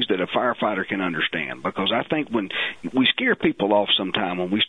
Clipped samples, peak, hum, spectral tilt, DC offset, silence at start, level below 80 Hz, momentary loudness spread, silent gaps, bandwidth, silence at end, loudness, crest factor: under 0.1%; -6 dBFS; none; -6.5 dB/octave; 0.2%; 0 s; -60 dBFS; 6 LU; none; 9.8 kHz; 0 s; -22 LUFS; 18 dB